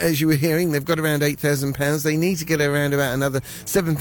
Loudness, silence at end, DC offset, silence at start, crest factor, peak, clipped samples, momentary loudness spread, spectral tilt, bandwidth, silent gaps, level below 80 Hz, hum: -21 LUFS; 0 s; under 0.1%; 0 s; 12 dB; -8 dBFS; under 0.1%; 4 LU; -5 dB/octave; 17.5 kHz; none; -48 dBFS; none